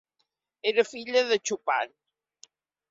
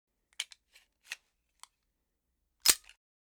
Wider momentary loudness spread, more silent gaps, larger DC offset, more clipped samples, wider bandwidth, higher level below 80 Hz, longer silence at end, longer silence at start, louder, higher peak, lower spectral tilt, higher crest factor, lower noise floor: second, 6 LU vs 20 LU; neither; neither; neither; second, 7.8 kHz vs over 20 kHz; second, -78 dBFS vs -70 dBFS; first, 1.05 s vs 0.45 s; first, 0.65 s vs 0.4 s; first, -27 LUFS vs -30 LUFS; about the same, -8 dBFS vs -8 dBFS; first, -1.5 dB/octave vs 2.5 dB/octave; second, 20 dB vs 32 dB; second, -78 dBFS vs -82 dBFS